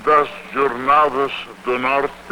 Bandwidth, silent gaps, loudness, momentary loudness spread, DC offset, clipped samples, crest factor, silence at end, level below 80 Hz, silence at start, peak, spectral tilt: 17.5 kHz; none; -18 LUFS; 9 LU; under 0.1%; under 0.1%; 16 dB; 0 s; -50 dBFS; 0 s; -2 dBFS; -5 dB/octave